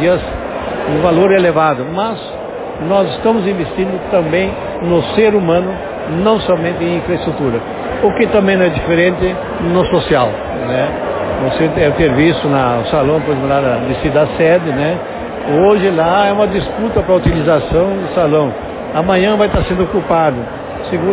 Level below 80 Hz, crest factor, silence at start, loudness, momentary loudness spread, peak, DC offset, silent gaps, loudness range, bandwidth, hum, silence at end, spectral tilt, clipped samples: -32 dBFS; 12 dB; 0 s; -14 LUFS; 9 LU; 0 dBFS; under 0.1%; none; 2 LU; 4 kHz; none; 0 s; -10.5 dB/octave; under 0.1%